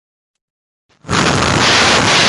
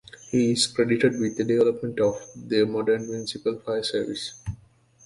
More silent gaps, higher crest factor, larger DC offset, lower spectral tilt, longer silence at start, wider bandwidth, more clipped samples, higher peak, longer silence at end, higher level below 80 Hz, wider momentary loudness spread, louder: neither; about the same, 14 dB vs 18 dB; neither; second, -2.5 dB/octave vs -4.5 dB/octave; first, 1.05 s vs 0.15 s; about the same, 11.5 kHz vs 11.5 kHz; neither; first, 0 dBFS vs -6 dBFS; second, 0 s vs 0.5 s; first, -34 dBFS vs -54 dBFS; second, 6 LU vs 11 LU; first, -11 LUFS vs -25 LUFS